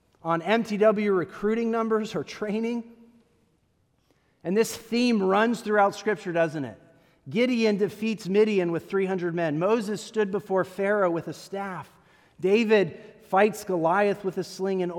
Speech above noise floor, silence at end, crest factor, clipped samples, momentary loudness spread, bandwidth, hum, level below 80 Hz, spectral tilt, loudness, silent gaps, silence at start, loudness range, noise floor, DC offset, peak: 43 dB; 0 s; 18 dB; under 0.1%; 10 LU; 17 kHz; none; -70 dBFS; -5.5 dB/octave; -25 LUFS; none; 0.25 s; 4 LU; -68 dBFS; under 0.1%; -8 dBFS